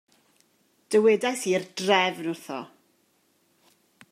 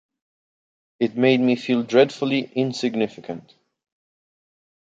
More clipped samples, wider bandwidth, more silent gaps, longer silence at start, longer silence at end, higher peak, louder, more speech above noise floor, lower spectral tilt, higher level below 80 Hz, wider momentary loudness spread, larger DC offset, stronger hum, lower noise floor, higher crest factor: neither; first, 15 kHz vs 7.8 kHz; neither; about the same, 0.9 s vs 1 s; about the same, 1.45 s vs 1.45 s; about the same, -6 dBFS vs -4 dBFS; second, -24 LUFS vs -21 LUFS; second, 43 dB vs over 69 dB; second, -3.5 dB/octave vs -6 dB/octave; second, -84 dBFS vs -70 dBFS; first, 16 LU vs 13 LU; neither; neither; second, -67 dBFS vs under -90 dBFS; about the same, 22 dB vs 20 dB